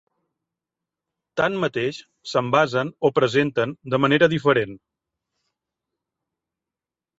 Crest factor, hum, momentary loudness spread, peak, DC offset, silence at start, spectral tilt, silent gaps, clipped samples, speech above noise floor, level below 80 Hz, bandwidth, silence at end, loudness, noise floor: 20 dB; none; 10 LU; -4 dBFS; under 0.1%; 1.35 s; -6 dB/octave; none; under 0.1%; 68 dB; -62 dBFS; 8 kHz; 2.4 s; -21 LUFS; -89 dBFS